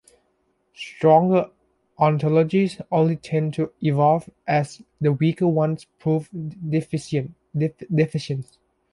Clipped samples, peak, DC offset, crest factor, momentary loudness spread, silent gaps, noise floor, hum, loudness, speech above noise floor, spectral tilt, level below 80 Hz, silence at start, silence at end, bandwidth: under 0.1%; -4 dBFS; under 0.1%; 18 dB; 12 LU; none; -68 dBFS; none; -22 LUFS; 47 dB; -8 dB/octave; -60 dBFS; 0.8 s; 0.5 s; 11.5 kHz